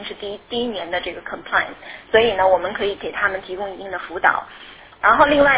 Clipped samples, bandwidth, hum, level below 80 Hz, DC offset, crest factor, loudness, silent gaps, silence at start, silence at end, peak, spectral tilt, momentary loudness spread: under 0.1%; 4 kHz; none; -48 dBFS; under 0.1%; 20 dB; -20 LUFS; none; 0 s; 0 s; 0 dBFS; -7.5 dB/octave; 16 LU